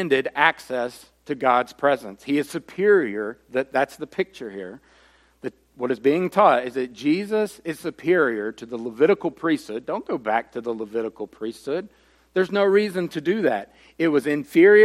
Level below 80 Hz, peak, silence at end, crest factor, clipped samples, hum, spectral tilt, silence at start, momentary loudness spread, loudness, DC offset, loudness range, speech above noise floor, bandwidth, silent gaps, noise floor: -66 dBFS; -2 dBFS; 0 s; 20 dB; under 0.1%; none; -6 dB/octave; 0 s; 14 LU; -23 LUFS; under 0.1%; 4 LU; 35 dB; 14 kHz; none; -57 dBFS